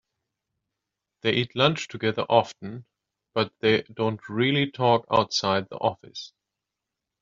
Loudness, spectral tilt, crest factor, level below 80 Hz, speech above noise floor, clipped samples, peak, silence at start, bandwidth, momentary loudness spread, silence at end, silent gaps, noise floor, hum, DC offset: -24 LUFS; -3.5 dB/octave; 22 dB; -64 dBFS; 61 dB; under 0.1%; -4 dBFS; 1.25 s; 7.6 kHz; 17 LU; 0.95 s; none; -86 dBFS; none; under 0.1%